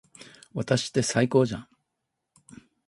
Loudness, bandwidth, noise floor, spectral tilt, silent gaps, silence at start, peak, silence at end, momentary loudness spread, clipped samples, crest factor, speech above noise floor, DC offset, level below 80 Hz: -25 LUFS; 11.5 kHz; -82 dBFS; -5 dB/octave; none; 0.2 s; -8 dBFS; 1.25 s; 16 LU; under 0.1%; 20 dB; 57 dB; under 0.1%; -60 dBFS